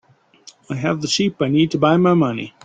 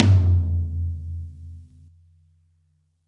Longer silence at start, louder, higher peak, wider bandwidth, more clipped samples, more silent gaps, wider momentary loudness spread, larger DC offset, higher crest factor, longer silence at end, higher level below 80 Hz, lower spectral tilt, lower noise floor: first, 0.7 s vs 0 s; first, -17 LUFS vs -23 LUFS; about the same, -2 dBFS vs -2 dBFS; first, 9.2 kHz vs 6 kHz; neither; neither; second, 8 LU vs 25 LU; neither; second, 16 dB vs 22 dB; second, 0.15 s vs 1.45 s; second, -56 dBFS vs -42 dBFS; second, -5.5 dB/octave vs -8.5 dB/octave; second, -48 dBFS vs -66 dBFS